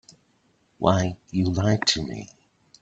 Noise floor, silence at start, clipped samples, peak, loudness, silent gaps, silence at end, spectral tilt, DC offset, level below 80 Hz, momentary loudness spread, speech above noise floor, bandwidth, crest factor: -65 dBFS; 0.8 s; under 0.1%; -2 dBFS; -24 LUFS; none; 0.55 s; -5 dB/octave; under 0.1%; -52 dBFS; 14 LU; 42 dB; 8.4 kHz; 24 dB